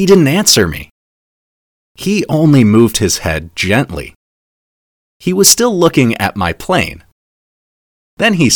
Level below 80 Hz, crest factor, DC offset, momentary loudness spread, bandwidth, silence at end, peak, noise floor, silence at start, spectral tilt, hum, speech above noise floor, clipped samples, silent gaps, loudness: -38 dBFS; 14 dB; under 0.1%; 14 LU; over 20 kHz; 0 s; 0 dBFS; under -90 dBFS; 0 s; -4 dB/octave; none; over 79 dB; 0.6%; 0.91-1.95 s, 4.16-5.20 s, 7.12-8.17 s; -11 LUFS